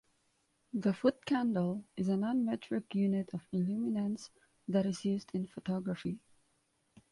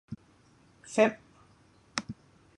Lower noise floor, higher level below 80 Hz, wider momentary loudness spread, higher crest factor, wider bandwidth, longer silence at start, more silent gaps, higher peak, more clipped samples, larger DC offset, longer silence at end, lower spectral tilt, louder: first, -76 dBFS vs -62 dBFS; about the same, -72 dBFS vs -68 dBFS; second, 9 LU vs 22 LU; second, 20 dB vs 26 dB; about the same, 11.5 kHz vs 11 kHz; first, 0.75 s vs 0.1 s; neither; second, -16 dBFS vs -10 dBFS; neither; neither; first, 0.95 s vs 0.45 s; first, -7.5 dB/octave vs -4 dB/octave; second, -35 LUFS vs -30 LUFS